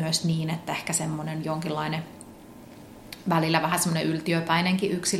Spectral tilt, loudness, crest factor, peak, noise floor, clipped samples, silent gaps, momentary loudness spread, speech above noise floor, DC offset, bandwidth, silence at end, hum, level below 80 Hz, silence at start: -4 dB/octave; -26 LUFS; 22 dB; -4 dBFS; -46 dBFS; under 0.1%; none; 23 LU; 20 dB; under 0.1%; 15.5 kHz; 0 s; none; -60 dBFS; 0 s